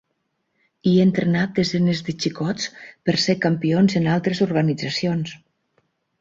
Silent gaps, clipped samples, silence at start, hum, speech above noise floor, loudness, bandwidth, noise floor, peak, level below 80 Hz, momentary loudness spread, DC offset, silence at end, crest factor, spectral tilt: none; under 0.1%; 0.85 s; none; 53 dB; -21 LUFS; 7.8 kHz; -73 dBFS; -6 dBFS; -56 dBFS; 9 LU; under 0.1%; 0.85 s; 16 dB; -6 dB/octave